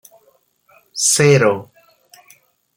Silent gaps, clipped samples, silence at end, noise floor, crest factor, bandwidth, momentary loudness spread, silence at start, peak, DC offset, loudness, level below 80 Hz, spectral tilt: none; under 0.1%; 1.15 s; -58 dBFS; 18 dB; 17 kHz; 15 LU; 0.95 s; 0 dBFS; under 0.1%; -14 LUFS; -60 dBFS; -3.5 dB/octave